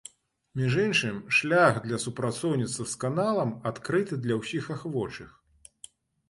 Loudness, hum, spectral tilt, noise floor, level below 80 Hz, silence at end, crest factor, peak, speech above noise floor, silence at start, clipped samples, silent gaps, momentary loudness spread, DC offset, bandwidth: -27 LUFS; none; -5 dB/octave; -53 dBFS; -62 dBFS; 1 s; 20 dB; -8 dBFS; 26 dB; 0.55 s; under 0.1%; none; 14 LU; under 0.1%; 11.5 kHz